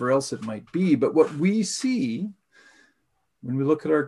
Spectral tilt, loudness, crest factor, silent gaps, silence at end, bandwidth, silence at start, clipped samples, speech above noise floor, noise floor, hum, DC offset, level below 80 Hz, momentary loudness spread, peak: -6 dB/octave; -24 LUFS; 18 dB; none; 0 s; 12 kHz; 0 s; under 0.1%; 51 dB; -74 dBFS; none; under 0.1%; -70 dBFS; 12 LU; -6 dBFS